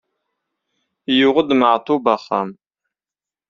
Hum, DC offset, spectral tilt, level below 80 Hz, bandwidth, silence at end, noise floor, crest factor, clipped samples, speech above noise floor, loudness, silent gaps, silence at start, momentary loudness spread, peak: none; under 0.1%; -2.5 dB/octave; -62 dBFS; 7 kHz; 0.95 s; under -90 dBFS; 18 dB; under 0.1%; over 74 dB; -17 LUFS; none; 1.1 s; 10 LU; -2 dBFS